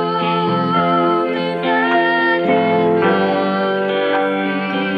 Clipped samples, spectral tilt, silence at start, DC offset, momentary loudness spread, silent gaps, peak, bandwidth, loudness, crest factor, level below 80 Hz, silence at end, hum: under 0.1%; -8 dB/octave; 0 s; under 0.1%; 4 LU; none; -4 dBFS; 5.8 kHz; -16 LUFS; 12 dB; -64 dBFS; 0 s; none